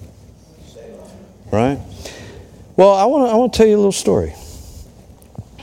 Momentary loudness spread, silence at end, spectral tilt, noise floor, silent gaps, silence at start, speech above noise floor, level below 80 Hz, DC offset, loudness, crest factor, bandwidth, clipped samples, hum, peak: 25 LU; 0 s; -5.5 dB/octave; -43 dBFS; none; 0 s; 30 dB; -40 dBFS; under 0.1%; -15 LUFS; 18 dB; 16 kHz; under 0.1%; none; 0 dBFS